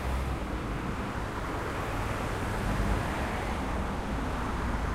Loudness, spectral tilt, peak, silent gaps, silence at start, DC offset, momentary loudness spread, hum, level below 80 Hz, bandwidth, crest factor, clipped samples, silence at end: -33 LUFS; -6 dB/octave; -18 dBFS; none; 0 s; under 0.1%; 4 LU; none; -36 dBFS; 15.5 kHz; 14 dB; under 0.1%; 0 s